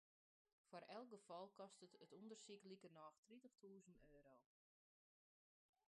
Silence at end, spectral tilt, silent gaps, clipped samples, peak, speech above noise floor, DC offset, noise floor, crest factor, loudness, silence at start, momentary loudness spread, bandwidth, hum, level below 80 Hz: 1.45 s; -4.5 dB/octave; 3.18-3.23 s; under 0.1%; -44 dBFS; over 27 dB; under 0.1%; under -90 dBFS; 20 dB; -63 LUFS; 0.65 s; 8 LU; 10.5 kHz; none; under -90 dBFS